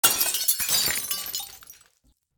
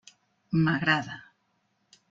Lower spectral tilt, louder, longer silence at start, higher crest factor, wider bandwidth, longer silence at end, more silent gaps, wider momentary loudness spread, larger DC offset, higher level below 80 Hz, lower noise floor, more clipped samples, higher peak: second, 1 dB/octave vs -6.5 dB/octave; first, -23 LUFS vs -26 LUFS; second, 0.05 s vs 0.5 s; about the same, 24 dB vs 20 dB; first, over 20 kHz vs 7.6 kHz; second, 0.65 s vs 0.9 s; neither; second, 12 LU vs 17 LU; neither; about the same, -58 dBFS vs -62 dBFS; second, -66 dBFS vs -73 dBFS; neither; first, -2 dBFS vs -10 dBFS